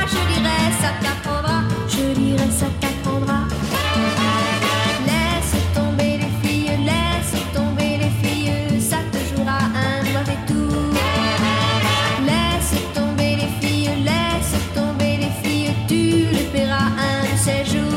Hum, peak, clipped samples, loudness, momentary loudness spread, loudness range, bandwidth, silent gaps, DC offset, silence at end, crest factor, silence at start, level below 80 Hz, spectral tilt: none; -4 dBFS; under 0.1%; -19 LUFS; 4 LU; 1 LU; 16.5 kHz; none; under 0.1%; 0 s; 14 dB; 0 s; -32 dBFS; -5 dB/octave